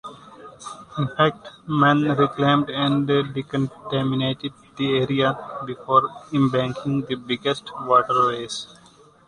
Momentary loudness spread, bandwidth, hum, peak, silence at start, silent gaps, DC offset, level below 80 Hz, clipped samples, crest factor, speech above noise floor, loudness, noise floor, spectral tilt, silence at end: 14 LU; 10.5 kHz; none; -4 dBFS; 0.05 s; none; under 0.1%; -58 dBFS; under 0.1%; 20 dB; 30 dB; -22 LUFS; -52 dBFS; -6.5 dB/octave; 0.6 s